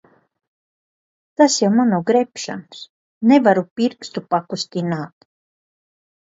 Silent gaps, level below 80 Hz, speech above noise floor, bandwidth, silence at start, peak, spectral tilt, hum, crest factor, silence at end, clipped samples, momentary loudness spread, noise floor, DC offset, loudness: 2.89-3.21 s, 3.71-3.76 s; -68 dBFS; over 72 dB; 8 kHz; 1.4 s; 0 dBFS; -5 dB/octave; none; 20 dB; 1.2 s; under 0.1%; 18 LU; under -90 dBFS; under 0.1%; -18 LUFS